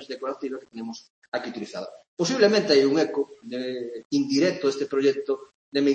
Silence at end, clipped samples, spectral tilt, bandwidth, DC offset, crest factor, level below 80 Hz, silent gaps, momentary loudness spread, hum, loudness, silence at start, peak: 0 s; under 0.1%; -4.5 dB/octave; 8.6 kHz; under 0.1%; 18 dB; -74 dBFS; 1.10-1.22 s, 1.28-1.32 s, 2.08-2.17 s, 4.05-4.10 s, 5.55-5.72 s; 17 LU; none; -25 LUFS; 0 s; -6 dBFS